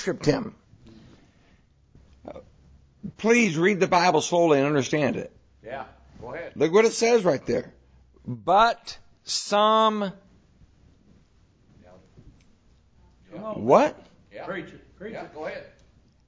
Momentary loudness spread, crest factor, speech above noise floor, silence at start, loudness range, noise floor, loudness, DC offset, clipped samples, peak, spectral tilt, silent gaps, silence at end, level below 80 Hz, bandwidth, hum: 22 LU; 22 dB; 36 dB; 0 s; 6 LU; -59 dBFS; -23 LUFS; under 0.1%; under 0.1%; -4 dBFS; -4.5 dB/octave; none; 0.65 s; -58 dBFS; 8 kHz; none